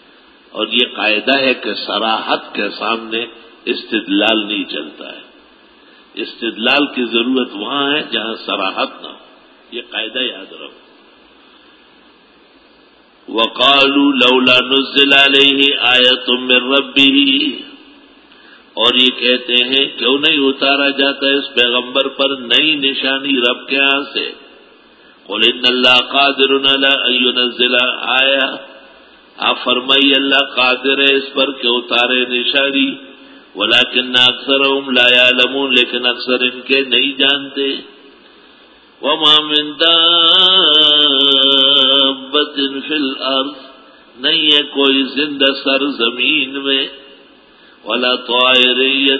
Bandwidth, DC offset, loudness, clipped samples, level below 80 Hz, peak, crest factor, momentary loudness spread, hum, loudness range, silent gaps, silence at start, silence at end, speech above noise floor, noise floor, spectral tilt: 8 kHz; under 0.1%; -12 LUFS; 0.1%; -62 dBFS; 0 dBFS; 14 dB; 13 LU; none; 9 LU; none; 0.55 s; 0 s; 34 dB; -48 dBFS; -3.5 dB/octave